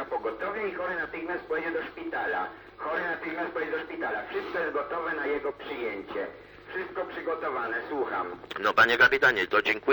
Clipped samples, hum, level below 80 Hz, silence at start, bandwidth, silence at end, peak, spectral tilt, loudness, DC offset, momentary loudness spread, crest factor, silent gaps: under 0.1%; none; -62 dBFS; 0 s; 19 kHz; 0 s; -8 dBFS; -4 dB/octave; -29 LUFS; under 0.1%; 13 LU; 20 dB; none